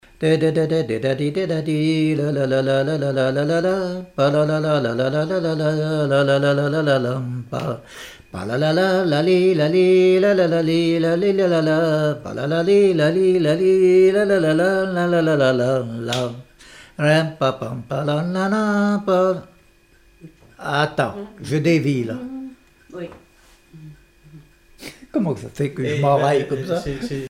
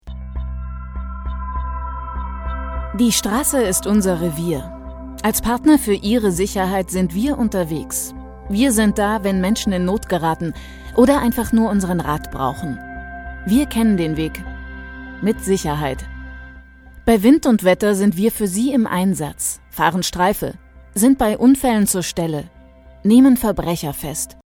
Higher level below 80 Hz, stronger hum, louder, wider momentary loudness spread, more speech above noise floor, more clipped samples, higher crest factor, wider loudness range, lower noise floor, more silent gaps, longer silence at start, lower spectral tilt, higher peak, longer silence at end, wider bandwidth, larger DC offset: second, -54 dBFS vs -32 dBFS; neither; about the same, -19 LUFS vs -18 LUFS; second, 13 LU vs 16 LU; first, 35 dB vs 27 dB; neither; about the same, 14 dB vs 18 dB; first, 8 LU vs 5 LU; first, -53 dBFS vs -44 dBFS; neither; first, 0.2 s vs 0.05 s; first, -7 dB/octave vs -5 dB/octave; second, -6 dBFS vs 0 dBFS; second, 0 s vs 0.2 s; second, 13.5 kHz vs 18.5 kHz; neither